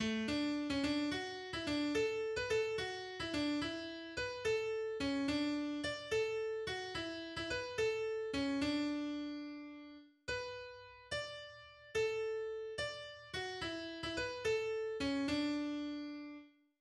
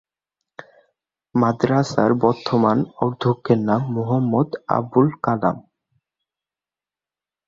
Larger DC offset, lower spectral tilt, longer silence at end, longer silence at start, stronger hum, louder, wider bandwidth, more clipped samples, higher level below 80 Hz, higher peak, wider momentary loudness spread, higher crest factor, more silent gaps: neither; second, -4 dB/octave vs -8 dB/octave; second, 0.3 s vs 1.9 s; second, 0 s vs 0.6 s; neither; second, -39 LUFS vs -20 LUFS; first, 12 kHz vs 7.6 kHz; neither; second, -64 dBFS vs -58 dBFS; second, -24 dBFS vs -2 dBFS; first, 11 LU vs 5 LU; about the same, 16 dB vs 20 dB; neither